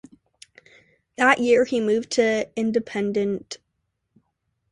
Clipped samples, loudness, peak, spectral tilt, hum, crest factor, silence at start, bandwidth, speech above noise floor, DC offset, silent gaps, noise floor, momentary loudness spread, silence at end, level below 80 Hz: under 0.1%; -22 LUFS; -2 dBFS; -4.5 dB/octave; none; 22 dB; 1.2 s; 11 kHz; 55 dB; under 0.1%; none; -76 dBFS; 16 LU; 1.15 s; -64 dBFS